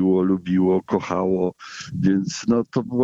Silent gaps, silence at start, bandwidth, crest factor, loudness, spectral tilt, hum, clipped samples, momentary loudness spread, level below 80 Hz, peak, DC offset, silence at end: none; 0 s; 7.8 kHz; 14 dB; -21 LUFS; -7 dB/octave; none; under 0.1%; 6 LU; -54 dBFS; -6 dBFS; under 0.1%; 0 s